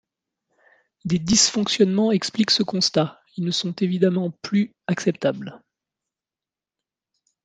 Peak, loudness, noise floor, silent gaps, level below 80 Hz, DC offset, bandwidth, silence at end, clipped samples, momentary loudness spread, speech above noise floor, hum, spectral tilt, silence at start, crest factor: -4 dBFS; -21 LUFS; under -90 dBFS; none; -58 dBFS; under 0.1%; 9.6 kHz; 1.85 s; under 0.1%; 9 LU; over 69 dB; none; -4 dB/octave; 1.05 s; 20 dB